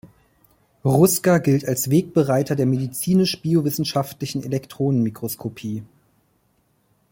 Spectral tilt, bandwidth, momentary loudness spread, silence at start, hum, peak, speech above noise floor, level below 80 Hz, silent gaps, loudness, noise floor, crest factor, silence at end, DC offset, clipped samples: -6 dB/octave; 17 kHz; 12 LU; 0.05 s; none; -2 dBFS; 45 dB; -58 dBFS; none; -21 LUFS; -65 dBFS; 18 dB; 1.25 s; under 0.1%; under 0.1%